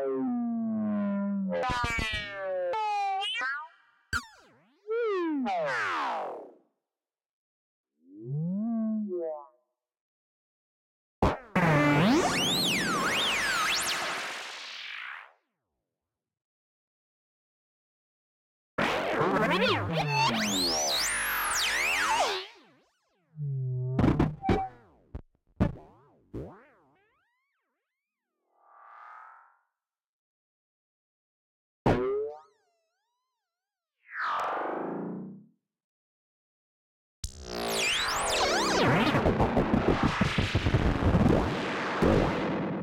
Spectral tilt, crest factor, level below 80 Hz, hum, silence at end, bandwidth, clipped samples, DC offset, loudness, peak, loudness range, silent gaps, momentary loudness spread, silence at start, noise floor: -4.5 dB/octave; 18 dB; -46 dBFS; none; 0 s; 16.5 kHz; under 0.1%; under 0.1%; -28 LUFS; -12 dBFS; 11 LU; 7.33-7.84 s, 10.01-11.22 s, 16.44-18.78 s, 30.07-31.85 s, 35.84-37.23 s; 15 LU; 0 s; under -90 dBFS